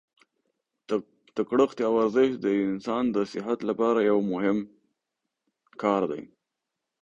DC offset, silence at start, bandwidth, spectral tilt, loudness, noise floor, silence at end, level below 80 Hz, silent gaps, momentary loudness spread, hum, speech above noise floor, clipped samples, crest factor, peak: under 0.1%; 0.9 s; 7.8 kHz; -7 dB/octave; -26 LUFS; -85 dBFS; 0.8 s; -68 dBFS; none; 8 LU; none; 60 dB; under 0.1%; 18 dB; -8 dBFS